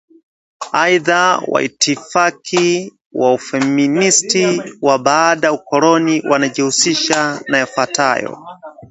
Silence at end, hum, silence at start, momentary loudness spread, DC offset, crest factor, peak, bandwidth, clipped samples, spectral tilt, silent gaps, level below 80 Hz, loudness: 0.05 s; none; 0.6 s; 6 LU; under 0.1%; 16 dB; 0 dBFS; 8.2 kHz; under 0.1%; -3 dB/octave; 3.06-3.10 s; -62 dBFS; -14 LUFS